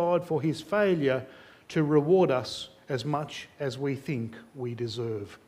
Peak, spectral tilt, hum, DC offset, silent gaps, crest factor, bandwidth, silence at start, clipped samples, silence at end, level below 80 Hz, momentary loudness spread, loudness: -10 dBFS; -6.5 dB/octave; none; under 0.1%; none; 18 dB; 15 kHz; 0 s; under 0.1%; 0.1 s; -66 dBFS; 14 LU; -29 LUFS